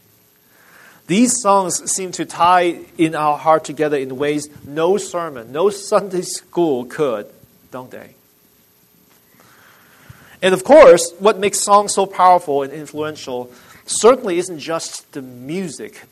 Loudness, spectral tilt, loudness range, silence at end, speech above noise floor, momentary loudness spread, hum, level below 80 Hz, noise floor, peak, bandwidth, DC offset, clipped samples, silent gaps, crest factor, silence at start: -16 LUFS; -3.5 dB/octave; 11 LU; 0.1 s; 38 dB; 15 LU; none; -54 dBFS; -54 dBFS; 0 dBFS; 13.5 kHz; under 0.1%; under 0.1%; none; 18 dB; 1.1 s